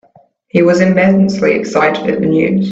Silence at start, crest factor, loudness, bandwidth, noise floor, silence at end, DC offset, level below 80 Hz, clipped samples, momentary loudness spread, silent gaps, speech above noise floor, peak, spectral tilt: 0.55 s; 12 dB; -12 LUFS; 7.8 kHz; -49 dBFS; 0 s; under 0.1%; -50 dBFS; under 0.1%; 4 LU; none; 38 dB; 0 dBFS; -7 dB/octave